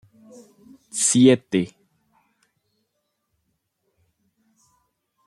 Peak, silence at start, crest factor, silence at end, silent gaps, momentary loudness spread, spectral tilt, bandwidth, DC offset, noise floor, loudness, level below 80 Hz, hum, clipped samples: -4 dBFS; 0.95 s; 22 dB; 3.6 s; none; 17 LU; -4.5 dB/octave; 12.5 kHz; under 0.1%; -75 dBFS; -19 LUFS; -68 dBFS; none; under 0.1%